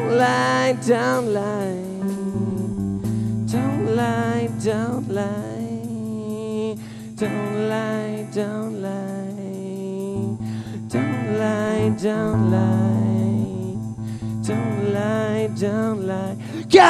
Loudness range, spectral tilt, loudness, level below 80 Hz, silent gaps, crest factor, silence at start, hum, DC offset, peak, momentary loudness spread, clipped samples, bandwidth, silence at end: 5 LU; -6.5 dB/octave; -23 LUFS; -52 dBFS; none; 22 dB; 0 s; none; under 0.1%; 0 dBFS; 10 LU; under 0.1%; 13.5 kHz; 0 s